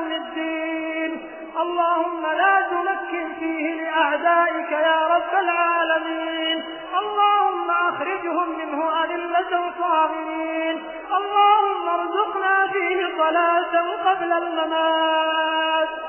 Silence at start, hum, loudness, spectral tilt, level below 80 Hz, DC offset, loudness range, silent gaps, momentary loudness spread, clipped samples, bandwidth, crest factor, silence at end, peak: 0 s; none; -21 LUFS; -5.5 dB/octave; -64 dBFS; under 0.1%; 3 LU; none; 8 LU; under 0.1%; 3.2 kHz; 16 dB; 0 s; -6 dBFS